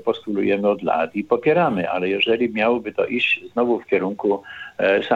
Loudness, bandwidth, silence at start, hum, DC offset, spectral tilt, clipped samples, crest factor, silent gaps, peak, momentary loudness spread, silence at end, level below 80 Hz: -20 LUFS; 7.4 kHz; 0.05 s; none; under 0.1%; -7 dB/octave; under 0.1%; 16 dB; none; -6 dBFS; 5 LU; 0 s; -64 dBFS